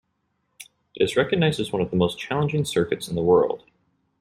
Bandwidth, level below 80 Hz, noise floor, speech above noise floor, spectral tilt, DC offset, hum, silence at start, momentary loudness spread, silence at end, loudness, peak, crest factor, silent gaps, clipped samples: 15 kHz; -54 dBFS; -73 dBFS; 51 dB; -6 dB/octave; under 0.1%; none; 0.6 s; 6 LU; 0.65 s; -23 LUFS; -6 dBFS; 18 dB; none; under 0.1%